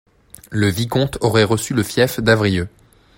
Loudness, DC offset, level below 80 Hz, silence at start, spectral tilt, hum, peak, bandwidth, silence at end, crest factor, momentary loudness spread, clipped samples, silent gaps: -18 LUFS; under 0.1%; -44 dBFS; 0.5 s; -5.5 dB/octave; none; 0 dBFS; 16.5 kHz; 0.5 s; 18 dB; 7 LU; under 0.1%; none